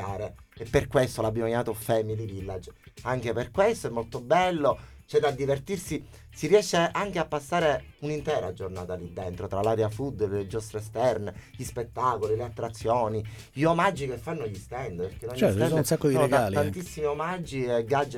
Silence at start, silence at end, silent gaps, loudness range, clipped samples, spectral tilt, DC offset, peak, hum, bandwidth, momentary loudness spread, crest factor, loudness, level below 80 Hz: 0 s; 0 s; none; 4 LU; under 0.1%; -5.5 dB/octave; under 0.1%; -8 dBFS; none; 16.5 kHz; 13 LU; 20 dB; -28 LUFS; -50 dBFS